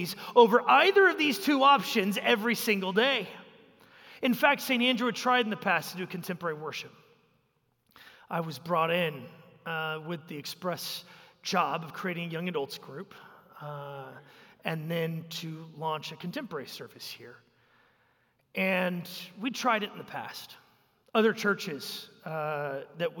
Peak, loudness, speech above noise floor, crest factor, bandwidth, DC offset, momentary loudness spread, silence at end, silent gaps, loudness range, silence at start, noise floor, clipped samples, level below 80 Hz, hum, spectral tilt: -6 dBFS; -28 LUFS; 44 dB; 24 dB; 17 kHz; under 0.1%; 19 LU; 0 s; none; 11 LU; 0 s; -73 dBFS; under 0.1%; -82 dBFS; none; -4.5 dB/octave